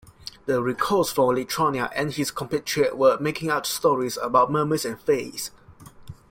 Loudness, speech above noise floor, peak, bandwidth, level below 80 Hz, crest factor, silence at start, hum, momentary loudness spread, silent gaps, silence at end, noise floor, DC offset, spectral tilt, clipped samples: -23 LUFS; 24 dB; -6 dBFS; 16.5 kHz; -56 dBFS; 18 dB; 0.2 s; none; 8 LU; none; 0.15 s; -47 dBFS; under 0.1%; -4.5 dB/octave; under 0.1%